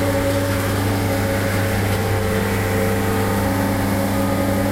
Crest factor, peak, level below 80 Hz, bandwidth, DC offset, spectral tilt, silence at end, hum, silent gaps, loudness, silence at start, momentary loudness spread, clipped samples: 12 dB; -8 dBFS; -34 dBFS; 16 kHz; 0.5%; -5.5 dB/octave; 0 s; none; none; -20 LUFS; 0 s; 1 LU; under 0.1%